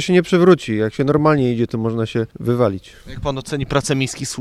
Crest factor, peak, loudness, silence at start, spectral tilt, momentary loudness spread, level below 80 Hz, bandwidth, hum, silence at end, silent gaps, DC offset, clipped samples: 18 dB; 0 dBFS; -18 LUFS; 0 s; -6 dB/octave; 12 LU; -42 dBFS; 13 kHz; none; 0 s; none; under 0.1%; under 0.1%